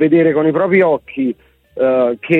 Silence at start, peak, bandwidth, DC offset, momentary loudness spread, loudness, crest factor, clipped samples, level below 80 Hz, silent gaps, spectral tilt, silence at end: 0 s; -2 dBFS; 4.1 kHz; under 0.1%; 10 LU; -14 LUFS; 12 dB; under 0.1%; -56 dBFS; none; -9.5 dB/octave; 0 s